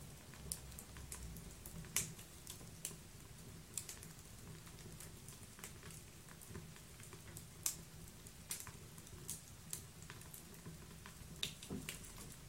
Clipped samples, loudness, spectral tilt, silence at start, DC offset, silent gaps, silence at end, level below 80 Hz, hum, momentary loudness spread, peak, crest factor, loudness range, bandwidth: under 0.1%; -50 LUFS; -2.5 dB/octave; 0 s; under 0.1%; none; 0 s; -62 dBFS; none; 13 LU; -16 dBFS; 36 dB; 5 LU; 16.5 kHz